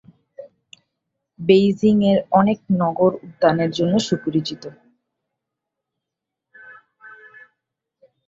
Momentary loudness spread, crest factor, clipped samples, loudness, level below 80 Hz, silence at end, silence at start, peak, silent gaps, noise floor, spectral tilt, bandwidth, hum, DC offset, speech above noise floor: 10 LU; 20 dB; under 0.1%; -18 LUFS; -60 dBFS; 1.15 s; 0.4 s; -2 dBFS; none; -84 dBFS; -7 dB/octave; 7.8 kHz; none; under 0.1%; 66 dB